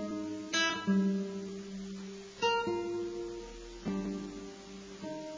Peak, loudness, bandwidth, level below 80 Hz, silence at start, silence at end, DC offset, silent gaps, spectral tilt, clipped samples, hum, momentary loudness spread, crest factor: -20 dBFS; -35 LUFS; 7.6 kHz; -60 dBFS; 0 s; 0 s; under 0.1%; none; -4.5 dB/octave; under 0.1%; none; 16 LU; 16 dB